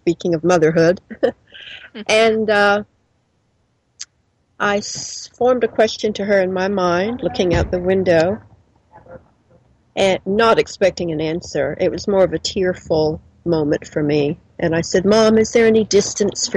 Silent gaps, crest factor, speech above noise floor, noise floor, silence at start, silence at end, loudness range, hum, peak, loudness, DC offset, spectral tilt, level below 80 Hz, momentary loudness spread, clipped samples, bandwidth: none; 14 dB; 47 dB; -63 dBFS; 0.05 s; 0 s; 4 LU; none; -4 dBFS; -17 LUFS; under 0.1%; -4.5 dB/octave; -42 dBFS; 12 LU; under 0.1%; 11 kHz